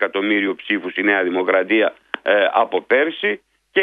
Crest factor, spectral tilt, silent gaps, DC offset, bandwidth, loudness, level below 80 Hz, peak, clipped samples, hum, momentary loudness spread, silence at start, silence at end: 18 dB; -6.5 dB/octave; none; under 0.1%; 4.7 kHz; -18 LUFS; -70 dBFS; -2 dBFS; under 0.1%; none; 6 LU; 0 s; 0 s